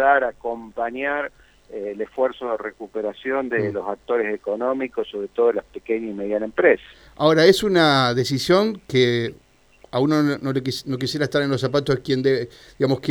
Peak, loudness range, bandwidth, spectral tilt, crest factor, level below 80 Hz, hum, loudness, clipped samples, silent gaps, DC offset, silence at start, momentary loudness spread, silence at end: -2 dBFS; 8 LU; 18.5 kHz; -5.5 dB/octave; 20 dB; -54 dBFS; none; -21 LUFS; under 0.1%; none; under 0.1%; 0 s; 12 LU; 0 s